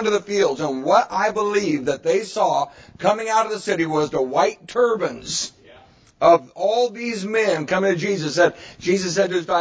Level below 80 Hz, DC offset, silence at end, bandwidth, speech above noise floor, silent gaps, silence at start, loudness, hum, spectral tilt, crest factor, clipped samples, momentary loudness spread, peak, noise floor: -58 dBFS; under 0.1%; 0 s; 8 kHz; 30 dB; none; 0 s; -20 LUFS; none; -4 dB/octave; 18 dB; under 0.1%; 6 LU; -2 dBFS; -50 dBFS